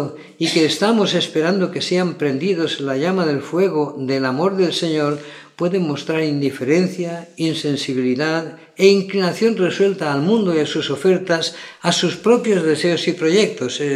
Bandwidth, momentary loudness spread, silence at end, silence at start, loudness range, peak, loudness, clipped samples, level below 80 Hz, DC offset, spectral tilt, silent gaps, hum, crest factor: 13.5 kHz; 7 LU; 0 s; 0 s; 3 LU; 0 dBFS; -18 LUFS; under 0.1%; -70 dBFS; under 0.1%; -5 dB/octave; none; none; 18 dB